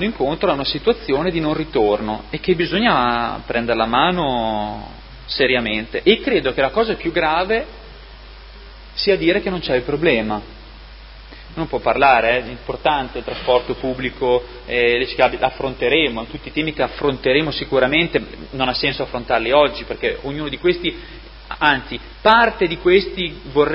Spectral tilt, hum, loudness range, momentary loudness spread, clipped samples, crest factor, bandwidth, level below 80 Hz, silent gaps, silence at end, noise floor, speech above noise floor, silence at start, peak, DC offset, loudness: -8 dB/octave; none; 2 LU; 10 LU; under 0.1%; 18 dB; 5.8 kHz; -38 dBFS; none; 0 s; -38 dBFS; 20 dB; 0 s; 0 dBFS; under 0.1%; -18 LUFS